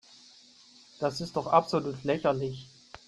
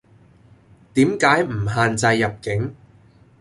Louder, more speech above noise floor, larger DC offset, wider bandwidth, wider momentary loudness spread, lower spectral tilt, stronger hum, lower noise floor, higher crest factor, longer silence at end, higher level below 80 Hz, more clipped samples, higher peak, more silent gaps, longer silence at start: second, -29 LUFS vs -19 LUFS; second, 28 dB vs 32 dB; neither; about the same, 12.5 kHz vs 11.5 kHz; first, 13 LU vs 9 LU; about the same, -6 dB/octave vs -5.5 dB/octave; neither; first, -57 dBFS vs -51 dBFS; about the same, 22 dB vs 20 dB; second, 0.1 s vs 0.65 s; second, -64 dBFS vs -48 dBFS; neither; second, -8 dBFS vs -2 dBFS; neither; about the same, 1 s vs 0.95 s